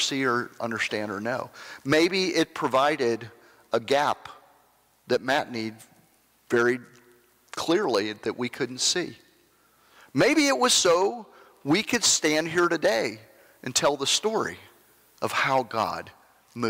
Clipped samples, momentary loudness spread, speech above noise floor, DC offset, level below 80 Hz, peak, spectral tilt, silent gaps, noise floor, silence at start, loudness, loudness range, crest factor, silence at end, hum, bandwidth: under 0.1%; 14 LU; 38 dB; under 0.1%; -66 dBFS; -10 dBFS; -2.5 dB/octave; none; -63 dBFS; 0 s; -25 LUFS; 6 LU; 16 dB; 0 s; none; 16 kHz